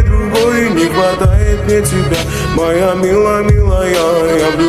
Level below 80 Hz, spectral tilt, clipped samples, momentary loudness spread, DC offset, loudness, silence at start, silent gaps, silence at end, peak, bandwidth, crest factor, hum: -18 dBFS; -5.5 dB/octave; under 0.1%; 3 LU; under 0.1%; -12 LUFS; 0 s; none; 0 s; 0 dBFS; 15.5 kHz; 10 dB; none